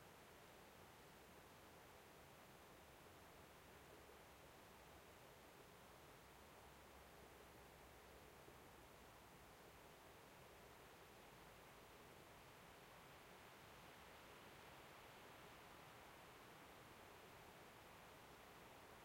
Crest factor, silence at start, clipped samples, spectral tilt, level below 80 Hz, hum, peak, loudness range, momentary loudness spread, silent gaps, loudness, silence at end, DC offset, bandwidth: 16 dB; 0 s; under 0.1%; -3.5 dB/octave; -78 dBFS; none; -48 dBFS; 2 LU; 2 LU; none; -64 LUFS; 0 s; under 0.1%; 16.5 kHz